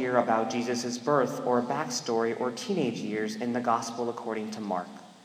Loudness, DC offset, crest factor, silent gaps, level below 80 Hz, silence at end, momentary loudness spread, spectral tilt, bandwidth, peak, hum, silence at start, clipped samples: -29 LUFS; under 0.1%; 20 dB; none; -78 dBFS; 0.05 s; 7 LU; -4.5 dB/octave; 16 kHz; -10 dBFS; none; 0 s; under 0.1%